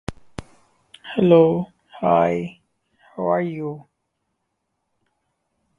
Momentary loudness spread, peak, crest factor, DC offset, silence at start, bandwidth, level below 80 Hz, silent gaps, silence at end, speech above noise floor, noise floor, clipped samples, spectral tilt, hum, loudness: 25 LU; -2 dBFS; 22 dB; under 0.1%; 0.1 s; 10.5 kHz; -54 dBFS; none; 2 s; 57 dB; -75 dBFS; under 0.1%; -8.5 dB/octave; none; -20 LUFS